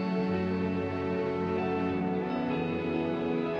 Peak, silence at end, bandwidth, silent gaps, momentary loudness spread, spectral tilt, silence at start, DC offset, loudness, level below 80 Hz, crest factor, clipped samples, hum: -18 dBFS; 0 s; 6.8 kHz; none; 1 LU; -8.5 dB/octave; 0 s; under 0.1%; -31 LUFS; -60 dBFS; 12 dB; under 0.1%; none